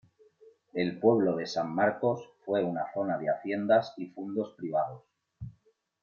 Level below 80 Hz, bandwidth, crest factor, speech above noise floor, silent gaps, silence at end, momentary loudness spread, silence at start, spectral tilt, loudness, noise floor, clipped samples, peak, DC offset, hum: -68 dBFS; 7.2 kHz; 20 dB; 39 dB; none; 0.5 s; 14 LU; 0.45 s; -7 dB/octave; -30 LUFS; -68 dBFS; under 0.1%; -12 dBFS; under 0.1%; none